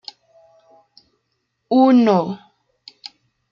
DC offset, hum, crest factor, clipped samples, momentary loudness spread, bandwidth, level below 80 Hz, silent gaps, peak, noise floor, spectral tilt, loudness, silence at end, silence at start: under 0.1%; none; 18 dB; under 0.1%; 26 LU; 7 kHz; -70 dBFS; none; -4 dBFS; -72 dBFS; -7.5 dB/octave; -16 LUFS; 1.15 s; 1.7 s